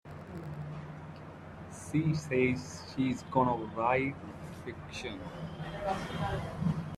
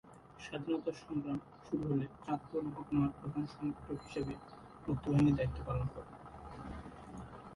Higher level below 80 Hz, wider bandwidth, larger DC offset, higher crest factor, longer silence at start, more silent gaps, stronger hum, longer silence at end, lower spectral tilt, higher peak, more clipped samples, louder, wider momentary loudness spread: about the same, -56 dBFS vs -54 dBFS; first, 13 kHz vs 11.5 kHz; neither; about the same, 22 dB vs 18 dB; about the same, 0.05 s vs 0.05 s; neither; neither; about the same, 0 s vs 0 s; second, -6.5 dB/octave vs -8.5 dB/octave; first, -12 dBFS vs -20 dBFS; neither; first, -34 LUFS vs -38 LUFS; about the same, 16 LU vs 17 LU